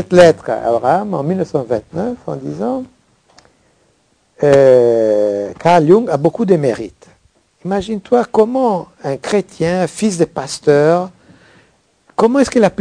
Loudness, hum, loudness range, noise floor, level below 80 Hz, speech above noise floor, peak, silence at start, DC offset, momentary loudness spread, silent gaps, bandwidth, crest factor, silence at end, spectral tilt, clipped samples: -14 LUFS; none; 7 LU; -57 dBFS; -50 dBFS; 44 dB; 0 dBFS; 0 s; under 0.1%; 13 LU; none; 10.5 kHz; 14 dB; 0.1 s; -6.5 dB/octave; 0.5%